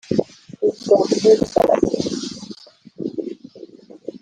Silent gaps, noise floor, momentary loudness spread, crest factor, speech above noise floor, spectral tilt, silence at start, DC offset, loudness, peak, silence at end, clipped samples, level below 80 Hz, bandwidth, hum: none; -41 dBFS; 22 LU; 18 dB; 24 dB; -5.5 dB/octave; 0.1 s; under 0.1%; -19 LUFS; -2 dBFS; 0.05 s; under 0.1%; -52 dBFS; 9.8 kHz; none